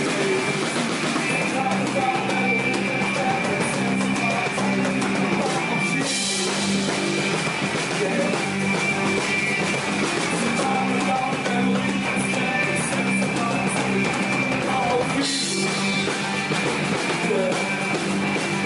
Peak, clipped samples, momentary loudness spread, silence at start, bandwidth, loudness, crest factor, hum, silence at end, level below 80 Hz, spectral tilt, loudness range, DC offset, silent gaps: -10 dBFS; under 0.1%; 2 LU; 0 s; 11.5 kHz; -22 LUFS; 12 dB; none; 0 s; -56 dBFS; -4 dB/octave; 0 LU; under 0.1%; none